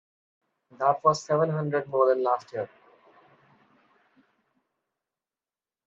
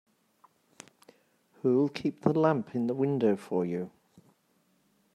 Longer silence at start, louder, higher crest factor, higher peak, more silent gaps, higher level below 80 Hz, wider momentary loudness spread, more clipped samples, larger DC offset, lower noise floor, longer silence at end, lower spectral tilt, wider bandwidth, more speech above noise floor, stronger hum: second, 0.8 s vs 1.65 s; first, -26 LUFS vs -29 LUFS; about the same, 22 dB vs 24 dB; about the same, -8 dBFS vs -8 dBFS; neither; about the same, -76 dBFS vs -74 dBFS; first, 12 LU vs 7 LU; neither; neither; first, under -90 dBFS vs -71 dBFS; first, 3.2 s vs 1.25 s; second, -6 dB/octave vs -8 dB/octave; second, 8 kHz vs 13 kHz; first, over 65 dB vs 43 dB; neither